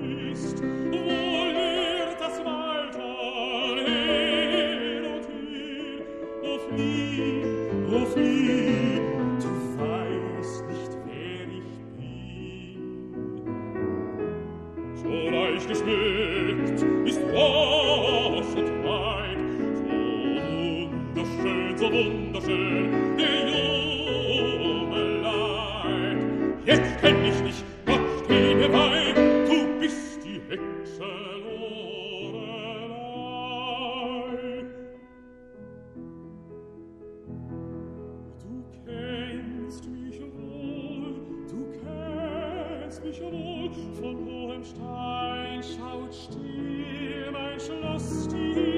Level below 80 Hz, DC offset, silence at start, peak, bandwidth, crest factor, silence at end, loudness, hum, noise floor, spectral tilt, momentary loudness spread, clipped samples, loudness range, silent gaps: -50 dBFS; under 0.1%; 0 s; -6 dBFS; 12 kHz; 22 dB; 0 s; -27 LUFS; none; -49 dBFS; -5.5 dB/octave; 17 LU; under 0.1%; 14 LU; none